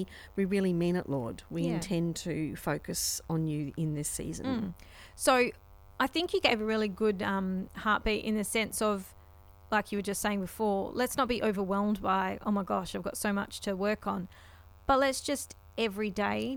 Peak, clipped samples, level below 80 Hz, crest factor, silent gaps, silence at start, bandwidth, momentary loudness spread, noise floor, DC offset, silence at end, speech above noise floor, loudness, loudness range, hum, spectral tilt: -10 dBFS; under 0.1%; -54 dBFS; 22 dB; none; 0 s; over 20 kHz; 8 LU; -55 dBFS; under 0.1%; 0 s; 24 dB; -31 LUFS; 3 LU; none; -4.5 dB/octave